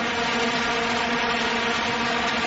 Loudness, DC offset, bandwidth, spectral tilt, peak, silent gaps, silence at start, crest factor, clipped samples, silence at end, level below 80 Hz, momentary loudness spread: -23 LUFS; under 0.1%; 8 kHz; -3 dB/octave; -12 dBFS; none; 0 s; 12 dB; under 0.1%; 0 s; -50 dBFS; 1 LU